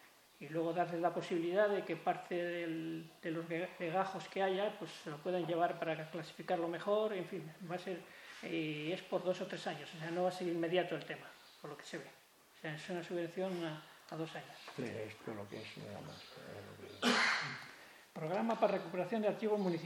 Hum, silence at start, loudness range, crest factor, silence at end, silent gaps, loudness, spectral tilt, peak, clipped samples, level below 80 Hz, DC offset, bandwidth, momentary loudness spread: none; 0 s; 7 LU; 22 dB; 0 s; none; -39 LUFS; -5 dB/octave; -18 dBFS; under 0.1%; -86 dBFS; under 0.1%; 17 kHz; 15 LU